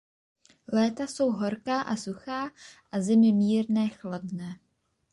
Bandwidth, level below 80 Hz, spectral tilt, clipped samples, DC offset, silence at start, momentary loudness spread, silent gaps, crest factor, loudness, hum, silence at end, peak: 11 kHz; -68 dBFS; -6 dB/octave; under 0.1%; under 0.1%; 0.7 s; 15 LU; none; 14 dB; -27 LUFS; none; 0.6 s; -14 dBFS